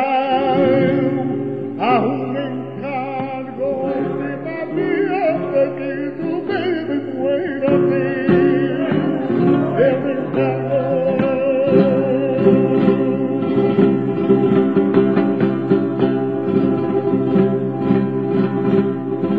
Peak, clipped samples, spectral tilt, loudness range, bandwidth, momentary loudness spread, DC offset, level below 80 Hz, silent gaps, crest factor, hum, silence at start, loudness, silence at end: -2 dBFS; under 0.1%; -10 dB/octave; 5 LU; 5 kHz; 9 LU; 0.4%; -56 dBFS; none; 16 dB; none; 0 s; -18 LUFS; 0 s